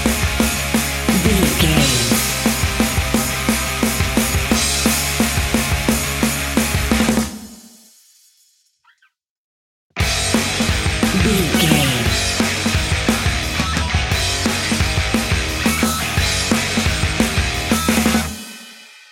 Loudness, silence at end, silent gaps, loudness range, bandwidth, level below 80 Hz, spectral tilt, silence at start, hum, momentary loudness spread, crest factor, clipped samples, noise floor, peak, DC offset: -17 LUFS; 0.3 s; 9.29-9.90 s; 6 LU; 16.5 kHz; -28 dBFS; -3.5 dB/octave; 0 s; none; 4 LU; 18 dB; under 0.1%; -62 dBFS; 0 dBFS; under 0.1%